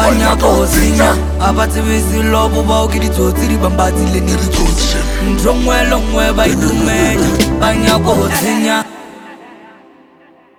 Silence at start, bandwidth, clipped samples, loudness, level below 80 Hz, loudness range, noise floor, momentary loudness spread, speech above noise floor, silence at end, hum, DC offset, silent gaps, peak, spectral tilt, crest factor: 0 s; 20 kHz; under 0.1%; -12 LUFS; -18 dBFS; 2 LU; -45 dBFS; 4 LU; 33 dB; 0.9 s; none; under 0.1%; none; 0 dBFS; -5 dB/octave; 12 dB